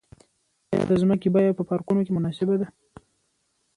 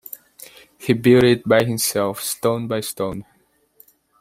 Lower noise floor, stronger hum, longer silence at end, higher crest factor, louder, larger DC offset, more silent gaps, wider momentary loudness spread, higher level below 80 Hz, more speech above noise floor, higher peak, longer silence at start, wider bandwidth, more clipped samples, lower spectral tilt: first, -71 dBFS vs -61 dBFS; neither; about the same, 1.05 s vs 1 s; about the same, 16 dB vs 18 dB; second, -24 LUFS vs -19 LUFS; neither; neither; second, 7 LU vs 18 LU; about the same, -58 dBFS vs -54 dBFS; first, 49 dB vs 43 dB; second, -8 dBFS vs -2 dBFS; about the same, 0.7 s vs 0.8 s; second, 10.5 kHz vs 16 kHz; neither; first, -9 dB/octave vs -5 dB/octave